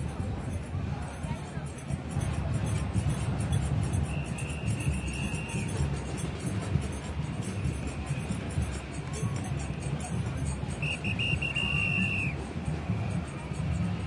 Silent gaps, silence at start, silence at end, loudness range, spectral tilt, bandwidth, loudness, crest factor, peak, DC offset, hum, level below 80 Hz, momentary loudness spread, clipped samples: none; 0 s; 0 s; 4 LU; -5.5 dB/octave; 11.5 kHz; -32 LUFS; 18 dB; -14 dBFS; under 0.1%; none; -42 dBFS; 8 LU; under 0.1%